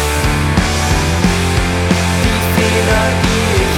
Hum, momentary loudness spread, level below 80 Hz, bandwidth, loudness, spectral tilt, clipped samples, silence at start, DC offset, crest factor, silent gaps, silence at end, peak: none; 2 LU; -22 dBFS; 18.5 kHz; -13 LUFS; -4.5 dB/octave; under 0.1%; 0 s; under 0.1%; 12 dB; none; 0 s; 0 dBFS